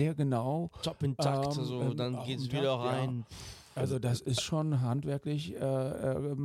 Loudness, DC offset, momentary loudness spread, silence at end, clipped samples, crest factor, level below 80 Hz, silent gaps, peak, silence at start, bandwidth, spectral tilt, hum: -33 LUFS; under 0.1%; 6 LU; 0 s; under 0.1%; 16 dB; -60 dBFS; none; -16 dBFS; 0 s; 14 kHz; -6.5 dB/octave; none